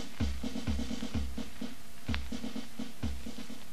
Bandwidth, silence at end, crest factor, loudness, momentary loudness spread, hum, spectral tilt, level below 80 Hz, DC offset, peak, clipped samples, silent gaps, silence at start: 14 kHz; 0 s; 26 dB; -39 LUFS; 8 LU; none; -5.5 dB/octave; -42 dBFS; 2%; -14 dBFS; under 0.1%; none; 0 s